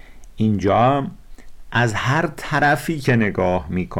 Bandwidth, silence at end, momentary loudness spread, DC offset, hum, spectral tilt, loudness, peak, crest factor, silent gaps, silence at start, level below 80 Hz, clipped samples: 16.5 kHz; 0 s; 7 LU; under 0.1%; none; -6.5 dB/octave; -19 LUFS; -8 dBFS; 12 dB; none; 0.1 s; -40 dBFS; under 0.1%